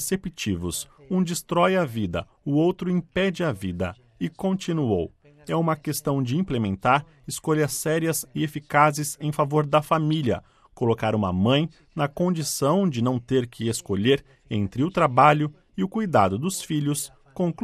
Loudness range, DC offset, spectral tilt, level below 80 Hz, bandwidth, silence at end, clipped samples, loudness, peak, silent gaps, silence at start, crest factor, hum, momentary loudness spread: 4 LU; under 0.1%; -5.5 dB/octave; -54 dBFS; 14.5 kHz; 0 s; under 0.1%; -24 LUFS; -2 dBFS; none; 0 s; 22 dB; none; 9 LU